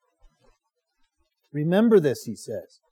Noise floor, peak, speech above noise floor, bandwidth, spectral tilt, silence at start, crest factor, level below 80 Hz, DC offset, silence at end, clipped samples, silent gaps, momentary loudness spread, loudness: -74 dBFS; -8 dBFS; 52 dB; 17 kHz; -7 dB/octave; 1.55 s; 18 dB; -68 dBFS; under 0.1%; 0.3 s; under 0.1%; none; 18 LU; -22 LUFS